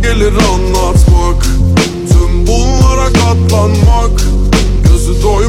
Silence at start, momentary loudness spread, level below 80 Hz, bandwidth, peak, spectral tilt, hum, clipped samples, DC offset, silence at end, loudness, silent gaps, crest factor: 0 s; 3 LU; -10 dBFS; 15 kHz; 0 dBFS; -5.5 dB/octave; none; 0.6%; under 0.1%; 0 s; -10 LUFS; none; 8 dB